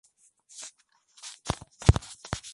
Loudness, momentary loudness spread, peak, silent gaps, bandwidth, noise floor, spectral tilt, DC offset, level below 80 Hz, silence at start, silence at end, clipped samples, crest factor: -29 LUFS; 20 LU; -2 dBFS; none; 11.5 kHz; -62 dBFS; -5.5 dB/octave; under 0.1%; -38 dBFS; 0.6 s; 0.05 s; under 0.1%; 28 dB